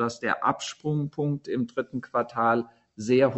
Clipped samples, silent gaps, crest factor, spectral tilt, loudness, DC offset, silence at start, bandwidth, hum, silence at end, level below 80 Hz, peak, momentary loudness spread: under 0.1%; none; 18 dB; -6 dB/octave; -27 LUFS; under 0.1%; 0 s; 8.2 kHz; none; 0 s; -66 dBFS; -8 dBFS; 7 LU